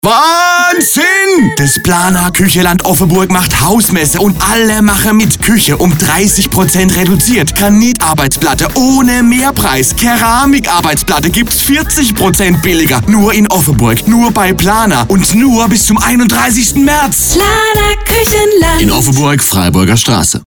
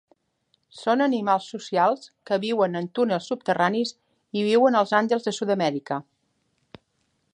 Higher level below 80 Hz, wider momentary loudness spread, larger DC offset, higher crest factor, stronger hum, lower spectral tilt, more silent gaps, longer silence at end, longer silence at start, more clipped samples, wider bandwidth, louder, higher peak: first, -24 dBFS vs -76 dBFS; second, 2 LU vs 11 LU; neither; second, 8 dB vs 20 dB; neither; second, -4 dB/octave vs -5.5 dB/octave; neither; second, 0.05 s vs 1.35 s; second, 0.05 s vs 0.75 s; neither; first, over 20 kHz vs 10.5 kHz; first, -8 LUFS vs -24 LUFS; first, 0 dBFS vs -4 dBFS